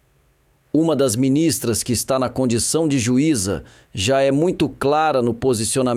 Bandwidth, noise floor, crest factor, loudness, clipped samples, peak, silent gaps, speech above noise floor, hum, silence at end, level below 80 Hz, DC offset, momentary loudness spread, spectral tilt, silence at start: 16 kHz; -59 dBFS; 14 dB; -19 LUFS; under 0.1%; -6 dBFS; none; 41 dB; none; 0 s; -48 dBFS; under 0.1%; 4 LU; -4.5 dB/octave; 0.75 s